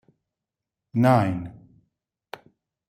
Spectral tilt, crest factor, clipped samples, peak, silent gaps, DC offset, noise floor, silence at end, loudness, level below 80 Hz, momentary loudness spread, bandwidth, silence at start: -8.5 dB/octave; 20 dB; under 0.1%; -6 dBFS; none; under 0.1%; -87 dBFS; 1.4 s; -22 LUFS; -62 dBFS; 24 LU; 15.5 kHz; 0.95 s